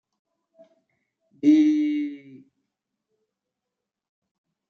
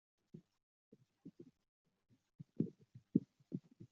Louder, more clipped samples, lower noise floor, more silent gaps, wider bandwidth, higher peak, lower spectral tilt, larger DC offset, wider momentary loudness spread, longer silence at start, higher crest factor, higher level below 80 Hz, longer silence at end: first, -21 LUFS vs -44 LUFS; neither; first, -86 dBFS vs -61 dBFS; second, none vs 0.63-0.92 s, 1.68-1.85 s, 2.35-2.39 s; first, 6.6 kHz vs 5.8 kHz; first, -8 dBFS vs -18 dBFS; second, -6 dB/octave vs -13 dB/octave; neither; second, 16 LU vs 23 LU; first, 1.45 s vs 0.35 s; second, 20 dB vs 30 dB; about the same, -86 dBFS vs -86 dBFS; first, 2.55 s vs 0.05 s